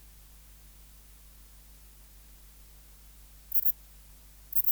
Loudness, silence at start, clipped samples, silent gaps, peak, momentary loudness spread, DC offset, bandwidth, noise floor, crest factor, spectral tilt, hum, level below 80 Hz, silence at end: -27 LUFS; 3.55 s; under 0.1%; none; -10 dBFS; 28 LU; under 0.1%; over 20 kHz; -53 dBFS; 28 dB; -2.5 dB/octave; 50 Hz at -55 dBFS; -56 dBFS; 0 s